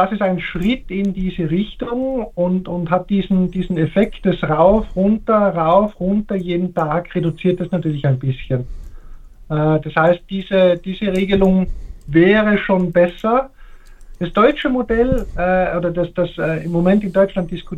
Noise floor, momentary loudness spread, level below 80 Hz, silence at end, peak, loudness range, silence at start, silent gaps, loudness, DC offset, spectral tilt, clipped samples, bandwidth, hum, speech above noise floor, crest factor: -38 dBFS; 7 LU; -34 dBFS; 0 s; 0 dBFS; 4 LU; 0 s; none; -17 LUFS; under 0.1%; -8.5 dB/octave; under 0.1%; 7.4 kHz; none; 21 dB; 16 dB